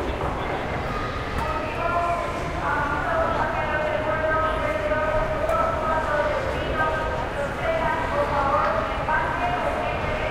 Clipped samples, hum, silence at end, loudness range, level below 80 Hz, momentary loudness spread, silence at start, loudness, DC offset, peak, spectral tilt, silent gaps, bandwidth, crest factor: under 0.1%; none; 0 s; 2 LU; -36 dBFS; 5 LU; 0 s; -24 LUFS; under 0.1%; -8 dBFS; -6 dB/octave; none; 15.5 kHz; 16 dB